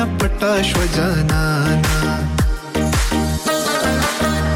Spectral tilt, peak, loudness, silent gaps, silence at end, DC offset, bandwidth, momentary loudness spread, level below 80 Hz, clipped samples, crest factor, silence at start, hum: -5 dB/octave; -8 dBFS; -18 LUFS; none; 0 s; under 0.1%; 17 kHz; 3 LU; -24 dBFS; under 0.1%; 10 dB; 0 s; none